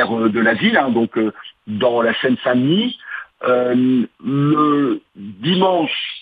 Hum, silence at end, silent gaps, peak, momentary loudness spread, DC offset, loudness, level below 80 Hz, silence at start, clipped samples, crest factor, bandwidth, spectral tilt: none; 0 s; none; -2 dBFS; 10 LU; under 0.1%; -17 LUFS; -64 dBFS; 0 s; under 0.1%; 16 dB; 4.9 kHz; -9 dB/octave